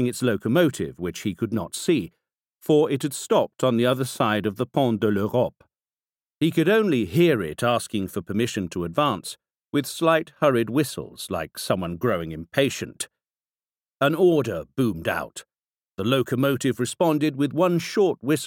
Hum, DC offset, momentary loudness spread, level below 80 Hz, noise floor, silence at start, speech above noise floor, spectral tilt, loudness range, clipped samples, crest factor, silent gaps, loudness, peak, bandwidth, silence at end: none; under 0.1%; 10 LU; -58 dBFS; under -90 dBFS; 0 s; over 67 dB; -5.5 dB/octave; 3 LU; under 0.1%; 20 dB; 6.35-6.39 s, 13.30-13.34 s; -23 LUFS; -4 dBFS; 17 kHz; 0 s